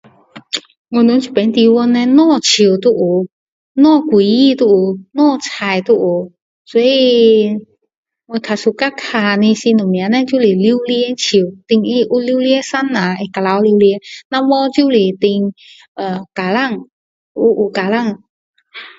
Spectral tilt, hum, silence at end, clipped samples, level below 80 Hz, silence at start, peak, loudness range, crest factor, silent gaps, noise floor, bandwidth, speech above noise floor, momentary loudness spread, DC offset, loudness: -5 dB/octave; none; 0.1 s; under 0.1%; -60 dBFS; 0.35 s; 0 dBFS; 5 LU; 14 dB; 0.77-0.85 s, 3.32-3.75 s, 6.42-6.65 s, 7.97-8.03 s, 14.25-14.30 s, 15.88-15.95 s, 16.92-17.35 s, 18.29-18.54 s; -36 dBFS; 7.8 kHz; 23 dB; 12 LU; under 0.1%; -13 LUFS